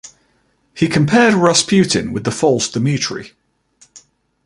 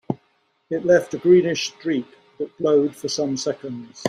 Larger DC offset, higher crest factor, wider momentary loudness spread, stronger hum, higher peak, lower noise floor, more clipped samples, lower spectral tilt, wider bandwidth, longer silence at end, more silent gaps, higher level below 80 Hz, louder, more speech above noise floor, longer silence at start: neither; about the same, 16 dB vs 18 dB; second, 9 LU vs 15 LU; neither; first, 0 dBFS vs -4 dBFS; second, -60 dBFS vs -65 dBFS; neither; about the same, -4.5 dB/octave vs -5 dB/octave; about the same, 11.5 kHz vs 12.5 kHz; first, 0.45 s vs 0 s; neither; first, -50 dBFS vs -62 dBFS; first, -15 LUFS vs -21 LUFS; about the same, 46 dB vs 45 dB; about the same, 0.05 s vs 0.1 s